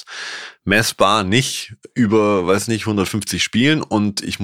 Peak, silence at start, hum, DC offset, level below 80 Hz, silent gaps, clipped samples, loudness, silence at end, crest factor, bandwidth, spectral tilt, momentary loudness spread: 0 dBFS; 0.05 s; none; under 0.1%; -50 dBFS; none; under 0.1%; -17 LUFS; 0 s; 18 dB; 16.5 kHz; -4.5 dB/octave; 13 LU